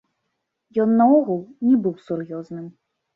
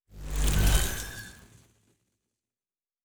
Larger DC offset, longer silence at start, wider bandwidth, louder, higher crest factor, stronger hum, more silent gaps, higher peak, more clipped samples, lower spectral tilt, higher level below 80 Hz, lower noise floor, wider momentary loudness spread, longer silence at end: neither; first, 0.75 s vs 0 s; second, 4.1 kHz vs over 20 kHz; first, -20 LUFS vs -29 LUFS; about the same, 16 dB vs 20 dB; neither; neither; first, -6 dBFS vs -10 dBFS; neither; first, -10.5 dB/octave vs -3.5 dB/octave; second, -70 dBFS vs -32 dBFS; second, -77 dBFS vs under -90 dBFS; about the same, 19 LU vs 17 LU; first, 0.45 s vs 0 s